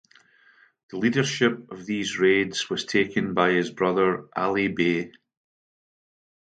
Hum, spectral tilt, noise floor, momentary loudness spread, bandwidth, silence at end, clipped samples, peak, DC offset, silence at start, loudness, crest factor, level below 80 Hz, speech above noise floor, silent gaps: none; -5 dB/octave; -58 dBFS; 8 LU; 9.2 kHz; 1.45 s; under 0.1%; -4 dBFS; under 0.1%; 0.9 s; -24 LUFS; 22 dB; -64 dBFS; 34 dB; none